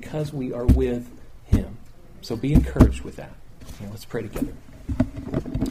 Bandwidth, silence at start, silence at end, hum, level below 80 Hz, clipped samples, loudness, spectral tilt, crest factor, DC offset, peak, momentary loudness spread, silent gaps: 15.5 kHz; 0 s; 0 s; none; -28 dBFS; under 0.1%; -24 LUFS; -8 dB/octave; 24 dB; under 0.1%; 0 dBFS; 21 LU; none